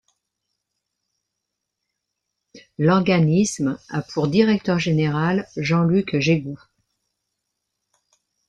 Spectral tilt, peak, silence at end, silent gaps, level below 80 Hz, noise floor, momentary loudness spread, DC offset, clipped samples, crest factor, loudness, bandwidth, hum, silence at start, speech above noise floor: -6.5 dB/octave; -4 dBFS; 1.9 s; none; -58 dBFS; -81 dBFS; 10 LU; under 0.1%; under 0.1%; 18 dB; -20 LUFS; 10.5 kHz; none; 2.55 s; 61 dB